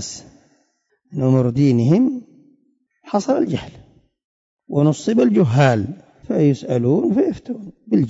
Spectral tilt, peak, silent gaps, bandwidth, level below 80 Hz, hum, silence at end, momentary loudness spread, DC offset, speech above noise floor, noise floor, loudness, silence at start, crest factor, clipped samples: -7.5 dB/octave; -4 dBFS; 4.24-4.57 s; 8 kHz; -54 dBFS; none; 0 s; 16 LU; under 0.1%; 48 dB; -65 dBFS; -18 LUFS; 0 s; 14 dB; under 0.1%